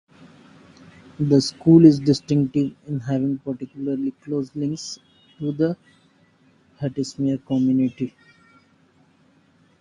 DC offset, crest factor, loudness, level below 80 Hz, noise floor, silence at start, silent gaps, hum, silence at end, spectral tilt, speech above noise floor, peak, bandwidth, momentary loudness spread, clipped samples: under 0.1%; 22 dB; -21 LUFS; -58 dBFS; -58 dBFS; 1.2 s; none; none; 1.7 s; -7.5 dB/octave; 38 dB; 0 dBFS; 11 kHz; 17 LU; under 0.1%